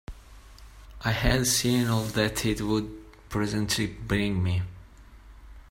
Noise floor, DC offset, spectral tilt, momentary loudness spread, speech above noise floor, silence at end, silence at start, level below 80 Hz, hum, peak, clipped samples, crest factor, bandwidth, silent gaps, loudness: -49 dBFS; under 0.1%; -4.5 dB/octave; 12 LU; 23 dB; 0.1 s; 0.1 s; -40 dBFS; none; -8 dBFS; under 0.1%; 20 dB; 16.5 kHz; none; -27 LUFS